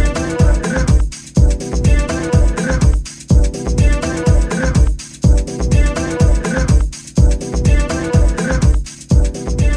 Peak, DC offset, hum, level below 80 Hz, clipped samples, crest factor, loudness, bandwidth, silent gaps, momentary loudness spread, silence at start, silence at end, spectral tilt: 0 dBFS; under 0.1%; none; -14 dBFS; under 0.1%; 12 dB; -16 LUFS; 11 kHz; none; 3 LU; 0 s; 0 s; -6 dB/octave